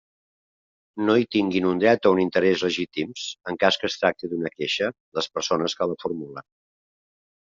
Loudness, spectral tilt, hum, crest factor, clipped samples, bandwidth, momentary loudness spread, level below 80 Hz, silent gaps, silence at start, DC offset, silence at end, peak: -23 LUFS; -3 dB/octave; none; 20 dB; under 0.1%; 7.6 kHz; 11 LU; -66 dBFS; 5.00-5.12 s; 0.95 s; under 0.1%; 1.1 s; -4 dBFS